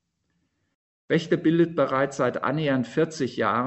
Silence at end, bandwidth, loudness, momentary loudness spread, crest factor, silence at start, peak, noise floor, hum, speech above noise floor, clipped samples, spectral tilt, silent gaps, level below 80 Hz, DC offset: 0 s; 8.2 kHz; -24 LUFS; 5 LU; 18 dB; 1.1 s; -8 dBFS; -74 dBFS; none; 50 dB; under 0.1%; -6.5 dB/octave; none; -64 dBFS; under 0.1%